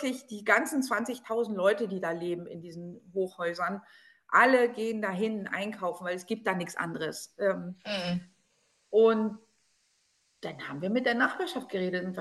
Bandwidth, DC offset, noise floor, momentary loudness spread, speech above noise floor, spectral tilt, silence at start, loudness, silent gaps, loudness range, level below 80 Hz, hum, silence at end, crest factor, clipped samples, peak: 12.5 kHz; under 0.1%; -72 dBFS; 14 LU; 42 dB; -5 dB/octave; 0 s; -30 LUFS; none; 4 LU; -78 dBFS; none; 0 s; 22 dB; under 0.1%; -8 dBFS